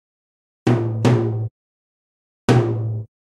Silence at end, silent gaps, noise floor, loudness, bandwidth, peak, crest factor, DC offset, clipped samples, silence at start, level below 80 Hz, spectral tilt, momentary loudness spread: 0.2 s; 1.51-2.48 s; under -90 dBFS; -20 LUFS; 10.5 kHz; -2 dBFS; 20 dB; under 0.1%; under 0.1%; 0.65 s; -52 dBFS; -7.5 dB/octave; 10 LU